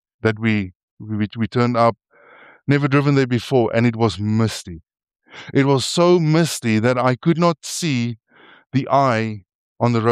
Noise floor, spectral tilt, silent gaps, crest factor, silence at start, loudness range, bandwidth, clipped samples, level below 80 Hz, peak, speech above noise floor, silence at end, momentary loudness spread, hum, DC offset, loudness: -48 dBFS; -6 dB/octave; 0.75-0.97 s, 9.55-9.75 s; 16 dB; 0.25 s; 2 LU; 15 kHz; under 0.1%; -56 dBFS; -2 dBFS; 30 dB; 0 s; 11 LU; none; under 0.1%; -19 LUFS